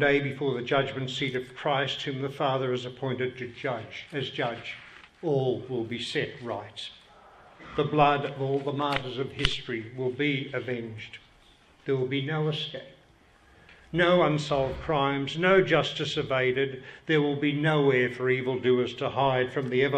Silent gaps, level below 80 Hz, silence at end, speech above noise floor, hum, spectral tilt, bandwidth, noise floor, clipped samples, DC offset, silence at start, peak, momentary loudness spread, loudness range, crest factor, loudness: none; -54 dBFS; 0 s; 31 dB; none; -6 dB/octave; 10 kHz; -59 dBFS; under 0.1%; under 0.1%; 0 s; -4 dBFS; 13 LU; 7 LU; 24 dB; -28 LUFS